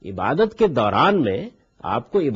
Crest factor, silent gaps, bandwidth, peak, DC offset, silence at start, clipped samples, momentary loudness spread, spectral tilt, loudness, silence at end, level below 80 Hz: 16 dB; none; 7.6 kHz; -4 dBFS; under 0.1%; 0.05 s; under 0.1%; 12 LU; -7.5 dB/octave; -20 LUFS; 0 s; -52 dBFS